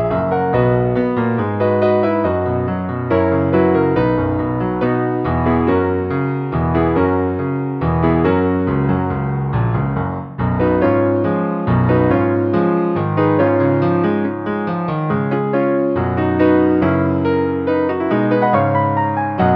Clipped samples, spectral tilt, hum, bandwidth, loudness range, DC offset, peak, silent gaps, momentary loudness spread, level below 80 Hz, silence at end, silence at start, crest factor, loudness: under 0.1%; -11 dB/octave; none; 5.4 kHz; 2 LU; under 0.1%; 0 dBFS; none; 5 LU; -38 dBFS; 0 s; 0 s; 14 dB; -17 LUFS